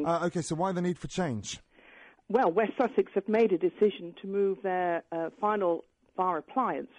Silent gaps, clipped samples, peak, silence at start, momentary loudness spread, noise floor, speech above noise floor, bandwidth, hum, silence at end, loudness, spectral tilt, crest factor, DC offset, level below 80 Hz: none; under 0.1%; -14 dBFS; 0 s; 9 LU; -56 dBFS; 27 dB; 10.5 kHz; none; 0.1 s; -29 LUFS; -6 dB/octave; 14 dB; under 0.1%; -62 dBFS